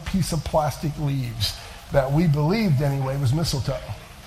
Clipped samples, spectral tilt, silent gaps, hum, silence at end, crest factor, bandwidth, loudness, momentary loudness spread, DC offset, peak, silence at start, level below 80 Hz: under 0.1%; -6 dB/octave; none; none; 0 s; 16 dB; 15.5 kHz; -23 LUFS; 7 LU; under 0.1%; -8 dBFS; 0 s; -38 dBFS